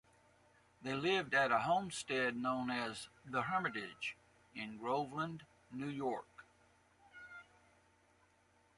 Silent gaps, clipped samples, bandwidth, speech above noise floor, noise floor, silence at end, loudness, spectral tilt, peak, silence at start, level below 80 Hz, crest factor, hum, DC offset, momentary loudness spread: none; under 0.1%; 11.5 kHz; 34 dB; -72 dBFS; 1.35 s; -39 LUFS; -4.5 dB/octave; -20 dBFS; 0.8 s; -76 dBFS; 20 dB; none; under 0.1%; 21 LU